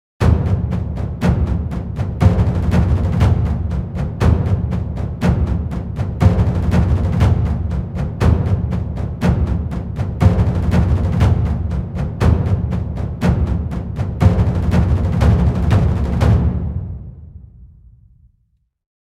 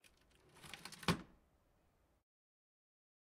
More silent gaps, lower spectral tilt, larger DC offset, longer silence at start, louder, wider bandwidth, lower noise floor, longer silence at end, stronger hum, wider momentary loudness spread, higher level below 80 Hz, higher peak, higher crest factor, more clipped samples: neither; first, -8.5 dB/octave vs -4.5 dB/octave; neither; second, 0.2 s vs 0.55 s; first, -17 LUFS vs -43 LUFS; second, 9.4 kHz vs 16 kHz; second, -63 dBFS vs -77 dBFS; second, 1.4 s vs 2 s; neither; second, 9 LU vs 20 LU; first, -22 dBFS vs -70 dBFS; first, 0 dBFS vs -20 dBFS; second, 16 dB vs 30 dB; neither